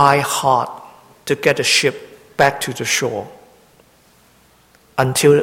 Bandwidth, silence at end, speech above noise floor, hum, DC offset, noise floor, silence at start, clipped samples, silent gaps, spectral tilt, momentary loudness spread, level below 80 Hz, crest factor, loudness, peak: 17 kHz; 0 s; 37 dB; none; under 0.1%; -52 dBFS; 0 s; under 0.1%; none; -3.5 dB/octave; 19 LU; -54 dBFS; 18 dB; -17 LUFS; 0 dBFS